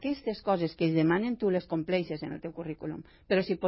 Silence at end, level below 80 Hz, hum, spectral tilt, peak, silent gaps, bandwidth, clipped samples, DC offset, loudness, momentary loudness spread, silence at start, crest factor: 0 s; -60 dBFS; none; -10.5 dB/octave; -14 dBFS; none; 5.8 kHz; under 0.1%; under 0.1%; -30 LUFS; 12 LU; 0 s; 16 dB